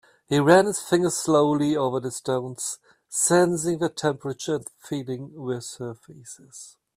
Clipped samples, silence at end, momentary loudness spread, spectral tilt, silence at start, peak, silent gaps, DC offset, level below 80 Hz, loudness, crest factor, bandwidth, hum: under 0.1%; 0.25 s; 21 LU; -4.5 dB/octave; 0.3 s; -2 dBFS; none; under 0.1%; -64 dBFS; -24 LUFS; 22 dB; 15.5 kHz; none